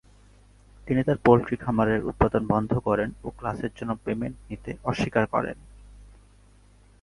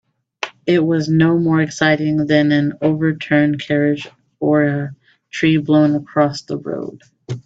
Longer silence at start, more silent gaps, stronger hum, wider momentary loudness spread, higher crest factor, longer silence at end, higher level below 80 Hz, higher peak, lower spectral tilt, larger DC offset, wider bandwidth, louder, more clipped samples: first, 0.85 s vs 0.45 s; neither; first, 50 Hz at -45 dBFS vs none; about the same, 13 LU vs 14 LU; first, 24 dB vs 16 dB; first, 1 s vs 0.05 s; first, -46 dBFS vs -58 dBFS; about the same, -2 dBFS vs 0 dBFS; about the same, -8 dB/octave vs -7 dB/octave; neither; first, 11.5 kHz vs 7.8 kHz; second, -26 LUFS vs -16 LUFS; neither